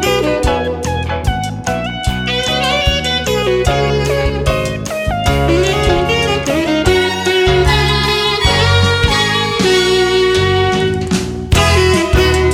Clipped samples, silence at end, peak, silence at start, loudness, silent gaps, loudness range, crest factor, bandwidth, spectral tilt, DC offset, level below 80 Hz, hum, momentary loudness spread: under 0.1%; 0 s; 0 dBFS; 0 s; -13 LUFS; none; 3 LU; 14 dB; 16.5 kHz; -4.5 dB/octave; under 0.1%; -22 dBFS; none; 7 LU